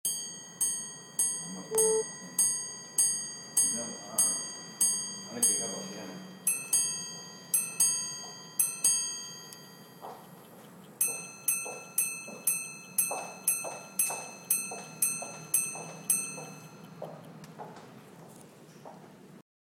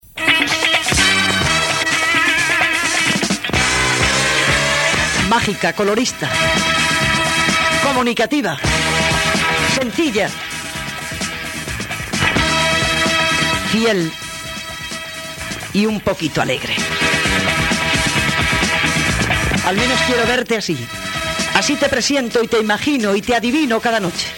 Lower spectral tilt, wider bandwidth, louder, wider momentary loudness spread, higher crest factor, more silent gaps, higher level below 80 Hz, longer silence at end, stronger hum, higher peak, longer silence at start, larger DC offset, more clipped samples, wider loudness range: second, -0.5 dB/octave vs -3 dB/octave; about the same, 17 kHz vs 18 kHz; second, -29 LUFS vs -15 LUFS; first, 21 LU vs 10 LU; first, 22 dB vs 16 dB; neither; second, -82 dBFS vs -36 dBFS; first, 0.3 s vs 0 s; neither; second, -12 dBFS vs 0 dBFS; about the same, 0.05 s vs 0.15 s; neither; neither; about the same, 6 LU vs 4 LU